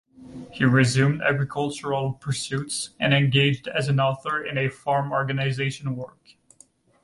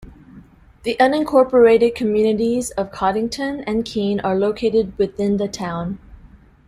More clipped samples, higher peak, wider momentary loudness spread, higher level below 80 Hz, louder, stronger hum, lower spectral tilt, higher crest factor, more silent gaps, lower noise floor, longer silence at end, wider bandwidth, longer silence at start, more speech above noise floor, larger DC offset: neither; second, -6 dBFS vs -2 dBFS; about the same, 12 LU vs 12 LU; second, -58 dBFS vs -46 dBFS; second, -23 LUFS vs -18 LUFS; neither; about the same, -5.5 dB/octave vs -5.5 dB/octave; about the same, 18 dB vs 16 dB; neither; first, -57 dBFS vs -46 dBFS; first, 0.95 s vs 0.55 s; second, 11.5 kHz vs 14.5 kHz; first, 0.2 s vs 0 s; first, 34 dB vs 28 dB; neither